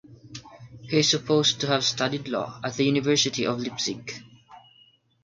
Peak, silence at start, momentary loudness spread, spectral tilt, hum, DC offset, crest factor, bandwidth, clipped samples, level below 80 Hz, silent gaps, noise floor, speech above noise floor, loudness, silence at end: -8 dBFS; 0.1 s; 21 LU; -3.5 dB/octave; none; under 0.1%; 20 dB; 9.4 kHz; under 0.1%; -64 dBFS; none; -59 dBFS; 35 dB; -24 LUFS; 0.65 s